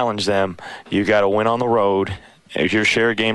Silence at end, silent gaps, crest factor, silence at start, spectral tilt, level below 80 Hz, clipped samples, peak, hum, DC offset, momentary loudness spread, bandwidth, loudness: 0 s; none; 14 dB; 0 s; -5 dB/octave; -52 dBFS; under 0.1%; -4 dBFS; none; under 0.1%; 11 LU; 11.5 kHz; -18 LUFS